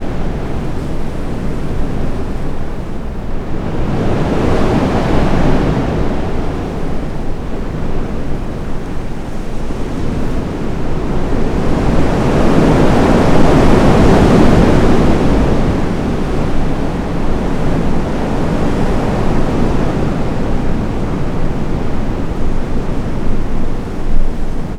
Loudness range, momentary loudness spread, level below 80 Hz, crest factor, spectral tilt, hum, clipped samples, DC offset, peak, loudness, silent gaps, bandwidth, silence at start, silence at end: 11 LU; 13 LU; -16 dBFS; 12 dB; -7.5 dB/octave; none; 0.2%; under 0.1%; 0 dBFS; -16 LUFS; none; 9.6 kHz; 0 s; 0 s